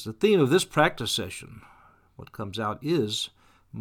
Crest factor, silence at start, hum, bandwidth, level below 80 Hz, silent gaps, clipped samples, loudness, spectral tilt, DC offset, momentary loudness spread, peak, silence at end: 20 dB; 0 s; none; 18 kHz; -58 dBFS; none; under 0.1%; -25 LUFS; -4.5 dB/octave; under 0.1%; 20 LU; -8 dBFS; 0 s